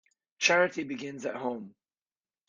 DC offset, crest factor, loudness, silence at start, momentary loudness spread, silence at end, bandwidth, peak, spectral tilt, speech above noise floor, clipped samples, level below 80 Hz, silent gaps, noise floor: under 0.1%; 22 dB; -29 LUFS; 0.4 s; 13 LU; 0.8 s; 7.6 kHz; -10 dBFS; -3 dB/octave; over 60 dB; under 0.1%; -80 dBFS; none; under -90 dBFS